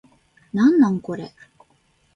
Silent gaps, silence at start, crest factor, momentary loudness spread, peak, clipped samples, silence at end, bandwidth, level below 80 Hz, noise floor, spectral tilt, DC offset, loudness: none; 0.55 s; 16 dB; 17 LU; -6 dBFS; under 0.1%; 0.85 s; 7.2 kHz; -62 dBFS; -62 dBFS; -8 dB/octave; under 0.1%; -19 LUFS